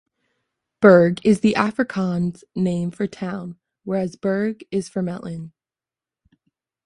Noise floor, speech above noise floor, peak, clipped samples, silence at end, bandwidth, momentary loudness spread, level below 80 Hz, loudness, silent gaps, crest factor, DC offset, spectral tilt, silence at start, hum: under -90 dBFS; over 70 dB; 0 dBFS; under 0.1%; 1.4 s; 11 kHz; 19 LU; -58 dBFS; -20 LUFS; none; 20 dB; under 0.1%; -7.5 dB/octave; 0.8 s; none